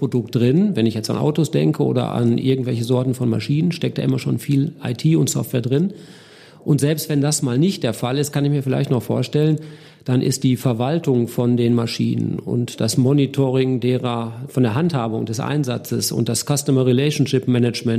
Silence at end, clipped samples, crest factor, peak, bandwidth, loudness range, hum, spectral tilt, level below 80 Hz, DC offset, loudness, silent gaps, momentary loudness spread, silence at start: 0 s; under 0.1%; 14 dB; -4 dBFS; 15.5 kHz; 2 LU; none; -6 dB/octave; -58 dBFS; under 0.1%; -19 LUFS; none; 5 LU; 0 s